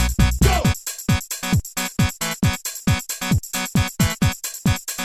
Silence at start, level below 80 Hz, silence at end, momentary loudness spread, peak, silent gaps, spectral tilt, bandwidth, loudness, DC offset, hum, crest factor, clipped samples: 0 s; -28 dBFS; 0 s; 5 LU; -2 dBFS; none; -4.5 dB/octave; 16.5 kHz; -21 LUFS; under 0.1%; none; 18 dB; under 0.1%